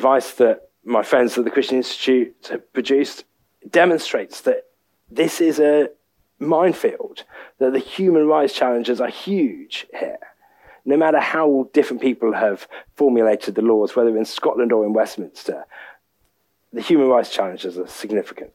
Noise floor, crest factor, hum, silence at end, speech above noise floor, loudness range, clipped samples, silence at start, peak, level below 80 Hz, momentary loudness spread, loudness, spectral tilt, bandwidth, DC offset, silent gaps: -67 dBFS; 16 dB; none; 0.05 s; 48 dB; 2 LU; under 0.1%; 0 s; -2 dBFS; -68 dBFS; 14 LU; -19 LUFS; -5 dB/octave; 16.5 kHz; under 0.1%; none